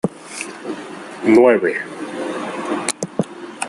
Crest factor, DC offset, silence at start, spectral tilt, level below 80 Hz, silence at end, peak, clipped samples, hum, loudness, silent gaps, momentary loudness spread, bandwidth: 20 dB; under 0.1%; 0.05 s; -4.5 dB/octave; -62 dBFS; 0 s; 0 dBFS; under 0.1%; none; -19 LUFS; none; 17 LU; 12 kHz